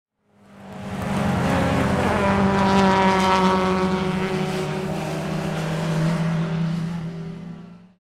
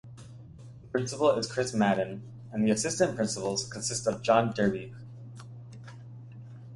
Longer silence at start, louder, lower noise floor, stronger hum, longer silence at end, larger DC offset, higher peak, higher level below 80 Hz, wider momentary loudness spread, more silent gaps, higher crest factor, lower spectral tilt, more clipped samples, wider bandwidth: first, 0.5 s vs 0.05 s; first, -21 LUFS vs -28 LUFS; first, -53 dBFS vs -48 dBFS; neither; first, 0.25 s vs 0 s; neither; first, -2 dBFS vs -8 dBFS; first, -42 dBFS vs -62 dBFS; second, 15 LU vs 21 LU; neither; about the same, 20 dB vs 22 dB; first, -6.5 dB/octave vs -4.5 dB/octave; neither; first, 14 kHz vs 11.5 kHz